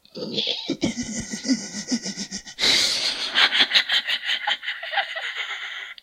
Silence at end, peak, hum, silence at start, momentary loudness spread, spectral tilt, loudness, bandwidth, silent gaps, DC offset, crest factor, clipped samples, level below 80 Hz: 0.1 s; -2 dBFS; none; 0.15 s; 13 LU; -1 dB/octave; -22 LUFS; 16 kHz; none; under 0.1%; 24 dB; under 0.1%; -56 dBFS